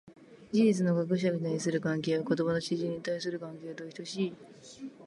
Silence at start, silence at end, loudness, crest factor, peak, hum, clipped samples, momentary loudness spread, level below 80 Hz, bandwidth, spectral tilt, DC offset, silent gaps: 0.05 s; 0 s; -31 LUFS; 16 dB; -16 dBFS; none; under 0.1%; 16 LU; -72 dBFS; 11.5 kHz; -6 dB/octave; under 0.1%; none